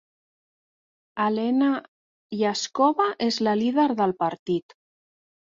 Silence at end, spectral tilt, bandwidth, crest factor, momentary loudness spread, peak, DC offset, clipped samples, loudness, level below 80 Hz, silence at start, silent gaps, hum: 0.95 s; -5 dB/octave; 7.6 kHz; 18 dB; 8 LU; -8 dBFS; under 0.1%; under 0.1%; -24 LUFS; -70 dBFS; 1.15 s; 1.88-2.30 s, 4.39-4.46 s; none